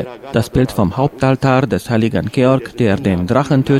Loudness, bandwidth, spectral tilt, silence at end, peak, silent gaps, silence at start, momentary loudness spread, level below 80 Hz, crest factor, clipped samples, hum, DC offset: -15 LUFS; 16 kHz; -7.5 dB/octave; 0 s; 0 dBFS; none; 0 s; 3 LU; -38 dBFS; 14 dB; under 0.1%; none; under 0.1%